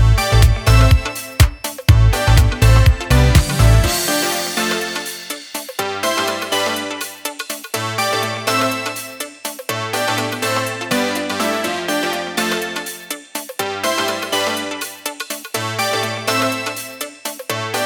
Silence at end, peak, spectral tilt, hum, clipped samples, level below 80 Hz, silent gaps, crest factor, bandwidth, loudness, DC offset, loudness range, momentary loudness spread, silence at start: 0 s; 0 dBFS; -4 dB/octave; none; under 0.1%; -22 dBFS; none; 16 dB; over 20 kHz; -18 LUFS; under 0.1%; 7 LU; 13 LU; 0 s